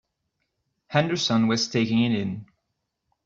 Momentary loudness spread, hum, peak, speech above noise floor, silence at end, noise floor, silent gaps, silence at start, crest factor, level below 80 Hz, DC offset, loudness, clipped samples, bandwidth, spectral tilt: 8 LU; none; -6 dBFS; 56 dB; 0.8 s; -79 dBFS; none; 0.9 s; 20 dB; -62 dBFS; under 0.1%; -24 LUFS; under 0.1%; 7.6 kHz; -5 dB/octave